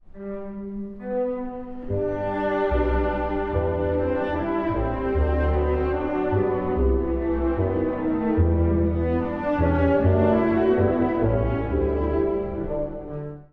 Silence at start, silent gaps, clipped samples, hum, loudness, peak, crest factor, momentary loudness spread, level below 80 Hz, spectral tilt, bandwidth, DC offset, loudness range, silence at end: 0.15 s; none; under 0.1%; none; -24 LUFS; -8 dBFS; 14 dB; 11 LU; -30 dBFS; -10.5 dB/octave; 4.7 kHz; under 0.1%; 4 LU; 0.05 s